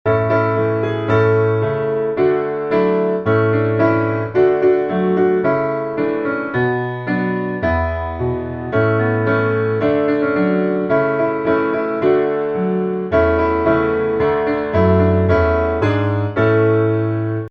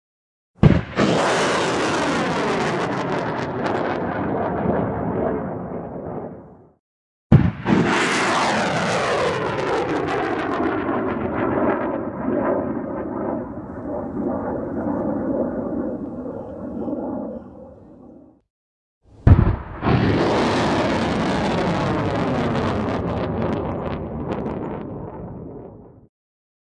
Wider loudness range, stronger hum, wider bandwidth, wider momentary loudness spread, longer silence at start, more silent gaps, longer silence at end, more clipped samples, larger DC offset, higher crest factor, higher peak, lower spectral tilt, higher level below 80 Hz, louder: second, 3 LU vs 7 LU; neither; second, 6 kHz vs 11.5 kHz; second, 5 LU vs 13 LU; second, 0.05 s vs 0.6 s; second, none vs 6.79-7.30 s, 18.50-19.01 s; second, 0 s vs 0.65 s; neither; neither; second, 14 dB vs 20 dB; about the same, -2 dBFS vs -2 dBFS; first, -10 dB/octave vs -6 dB/octave; about the same, -38 dBFS vs -36 dBFS; first, -17 LUFS vs -22 LUFS